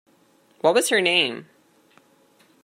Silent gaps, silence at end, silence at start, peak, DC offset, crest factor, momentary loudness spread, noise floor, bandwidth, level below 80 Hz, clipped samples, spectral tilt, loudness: none; 1.2 s; 0.65 s; -4 dBFS; under 0.1%; 22 dB; 8 LU; -59 dBFS; 16 kHz; -80 dBFS; under 0.1%; -2 dB/octave; -20 LUFS